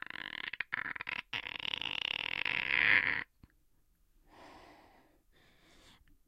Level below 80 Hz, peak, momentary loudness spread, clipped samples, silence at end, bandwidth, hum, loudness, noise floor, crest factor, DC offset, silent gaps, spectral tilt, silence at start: -68 dBFS; -12 dBFS; 14 LU; under 0.1%; 0.35 s; 16 kHz; none; -33 LUFS; -70 dBFS; 26 dB; under 0.1%; none; -2.5 dB/octave; 0.15 s